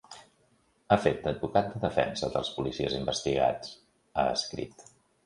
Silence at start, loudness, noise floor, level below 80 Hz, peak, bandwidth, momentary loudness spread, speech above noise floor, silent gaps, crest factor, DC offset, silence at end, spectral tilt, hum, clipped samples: 0.1 s; -30 LUFS; -68 dBFS; -54 dBFS; -8 dBFS; 11.5 kHz; 13 LU; 39 dB; none; 24 dB; under 0.1%; 0.45 s; -5 dB/octave; none; under 0.1%